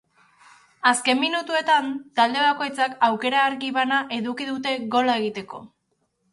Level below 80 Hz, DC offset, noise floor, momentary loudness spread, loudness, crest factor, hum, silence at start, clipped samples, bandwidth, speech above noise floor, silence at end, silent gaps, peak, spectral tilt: -72 dBFS; under 0.1%; -72 dBFS; 8 LU; -22 LUFS; 20 dB; none; 0.85 s; under 0.1%; 11.5 kHz; 49 dB; 0.65 s; none; -4 dBFS; -2.5 dB/octave